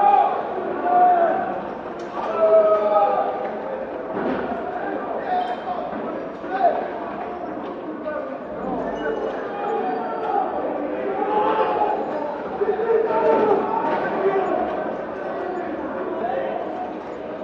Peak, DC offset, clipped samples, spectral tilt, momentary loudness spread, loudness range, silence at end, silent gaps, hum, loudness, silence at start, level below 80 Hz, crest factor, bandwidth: -4 dBFS; under 0.1%; under 0.1%; -7.5 dB/octave; 12 LU; 7 LU; 0 s; none; none; -23 LUFS; 0 s; -58 dBFS; 18 dB; 7 kHz